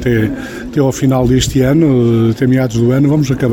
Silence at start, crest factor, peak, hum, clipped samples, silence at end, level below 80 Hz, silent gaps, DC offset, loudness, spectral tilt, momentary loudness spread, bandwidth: 0 s; 10 dB; 0 dBFS; none; under 0.1%; 0 s; -32 dBFS; none; under 0.1%; -12 LUFS; -6.5 dB/octave; 5 LU; 17 kHz